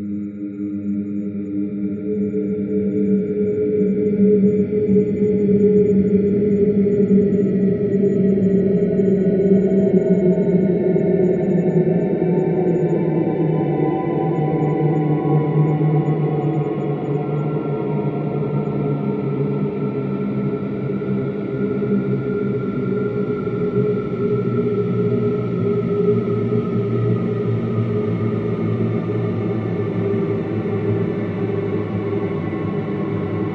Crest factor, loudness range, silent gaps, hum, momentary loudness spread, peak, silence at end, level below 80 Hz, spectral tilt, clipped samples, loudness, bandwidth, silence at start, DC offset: 14 dB; 6 LU; none; none; 7 LU; -4 dBFS; 0 s; -52 dBFS; -11.5 dB/octave; under 0.1%; -19 LUFS; 4.3 kHz; 0 s; under 0.1%